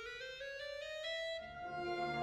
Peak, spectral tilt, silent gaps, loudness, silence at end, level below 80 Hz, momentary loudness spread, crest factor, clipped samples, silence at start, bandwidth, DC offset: -28 dBFS; -4 dB/octave; none; -43 LUFS; 0 s; -68 dBFS; 6 LU; 16 dB; under 0.1%; 0 s; 14 kHz; under 0.1%